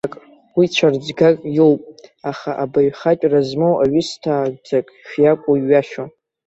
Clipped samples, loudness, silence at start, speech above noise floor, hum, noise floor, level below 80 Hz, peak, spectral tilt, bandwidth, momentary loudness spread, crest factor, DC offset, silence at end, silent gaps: under 0.1%; -17 LUFS; 0.05 s; 24 dB; none; -40 dBFS; -58 dBFS; -2 dBFS; -6.5 dB/octave; 8 kHz; 13 LU; 16 dB; under 0.1%; 0.4 s; none